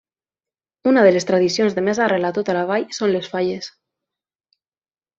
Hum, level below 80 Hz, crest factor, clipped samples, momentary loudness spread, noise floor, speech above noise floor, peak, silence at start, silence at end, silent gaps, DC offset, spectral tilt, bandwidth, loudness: none; -64 dBFS; 18 dB; under 0.1%; 10 LU; under -90 dBFS; over 72 dB; -2 dBFS; 0.85 s; 1.5 s; none; under 0.1%; -5 dB/octave; 7.8 kHz; -18 LUFS